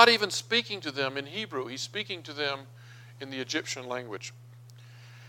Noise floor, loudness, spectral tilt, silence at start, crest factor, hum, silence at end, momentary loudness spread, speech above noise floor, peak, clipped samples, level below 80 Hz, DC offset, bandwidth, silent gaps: -50 dBFS; -31 LUFS; -2.5 dB/octave; 0 s; 30 dB; 60 Hz at -50 dBFS; 0 s; 23 LU; 19 dB; -2 dBFS; under 0.1%; -80 dBFS; under 0.1%; 17 kHz; none